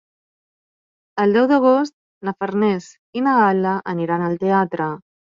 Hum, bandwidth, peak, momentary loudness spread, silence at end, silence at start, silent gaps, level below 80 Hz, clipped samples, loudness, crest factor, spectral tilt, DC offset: none; 7.6 kHz; -4 dBFS; 14 LU; 0.4 s; 1.15 s; 1.93-2.21 s, 2.98-3.13 s; -66 dBFS; under 0.1%; -19 LUFS; 14 dB; -7.5 dB/octave; under 0.1%